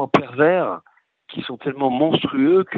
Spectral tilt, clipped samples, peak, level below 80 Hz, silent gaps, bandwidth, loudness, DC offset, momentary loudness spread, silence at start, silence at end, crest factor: -7.5 dB/octave; under 0.1%; 0 dBFS; -62 dBFS; none; 7 kHz; -19 LUFS; under 0.1%; 15 LU; 0 s; 0 s; 18 dB